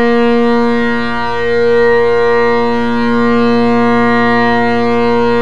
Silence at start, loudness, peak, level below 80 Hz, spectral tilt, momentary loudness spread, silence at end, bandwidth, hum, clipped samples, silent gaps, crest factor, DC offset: 0 s; -11 LUFS; 0 dBFS; -38 dBFS; -6.5 dB/octave; 4 LU; 0 s; 7.4 kHz; none; under 0.1%; none; 10 dB; 10%